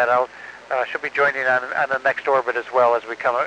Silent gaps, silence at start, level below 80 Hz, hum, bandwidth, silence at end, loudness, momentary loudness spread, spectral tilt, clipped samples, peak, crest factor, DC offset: none; 0 s; -68 dBFS; none; 9.4 kHz; 0 s; -20 LUFS; 7 LU; -4 dB/octave; under 0.1%; -6 dBFS; 14 dB; under 0.1%